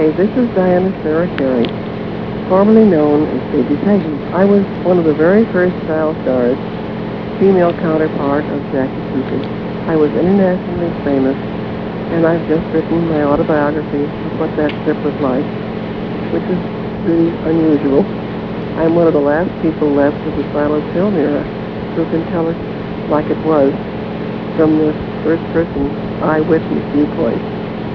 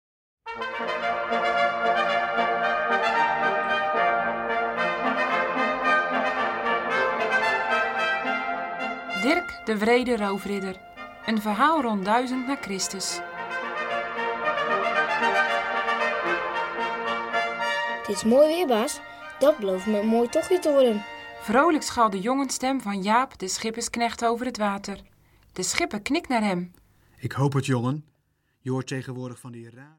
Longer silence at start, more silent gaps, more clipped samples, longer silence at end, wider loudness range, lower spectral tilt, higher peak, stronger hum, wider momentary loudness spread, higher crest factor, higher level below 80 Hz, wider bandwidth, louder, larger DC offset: second, 0 s vs 0.45 s; neither; neither; about the same, 0 s vs 0.1 s; about the same, 4 LU vs 4 LU; first, -10 dB/octave vs -4 dB/octave; first, 0 dBFS vs -4 dBFS; neither; about the same, 10 LU vs 10 LU; second, 14 dB vs 22 dB; first, -40 dBFS vs -60 dBFS; second, 5.4 kHz vs 17 kHz; first, -15 LUFS vs -24 LUFS; first, 0.4% vs under 0.1%